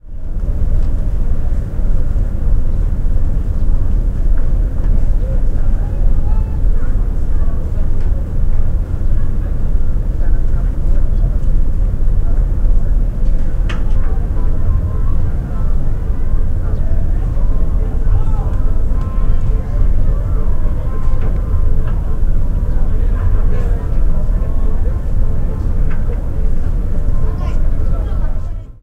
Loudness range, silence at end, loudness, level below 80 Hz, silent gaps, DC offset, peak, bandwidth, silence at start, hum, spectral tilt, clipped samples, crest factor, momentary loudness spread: 1 LU; 0.05 s; -20 LUFS; -12 dBFS; none; 0.8%; 0 dBFS; 2.9 kHz; 0.05 s; none; -9 dB/octave; under 0.1%; 10 dB; 3 LU